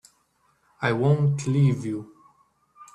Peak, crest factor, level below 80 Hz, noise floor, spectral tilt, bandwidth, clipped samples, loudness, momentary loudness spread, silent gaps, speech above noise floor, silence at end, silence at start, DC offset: -8 dBFS; 16 dB; -62 dBFS; -67 dBFS; -7.5 dB/octave; 9.8 kHz; under 0.1%; -24 LUFS; 10 LU; none; 45 dB; 0.1 s; 0.8 s; under 0.1%